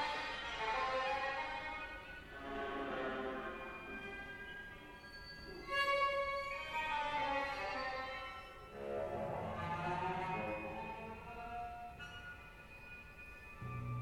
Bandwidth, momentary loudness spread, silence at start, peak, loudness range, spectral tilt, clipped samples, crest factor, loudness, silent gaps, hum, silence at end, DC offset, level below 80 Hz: 17 kHz; 15 LU; 0 s; -24 dBFS; 7 LU; -5 dB/octave; under 0.1%; 18 dB; -42 LUFS; none; none; 0 s; under 0.1%; -60 dBFS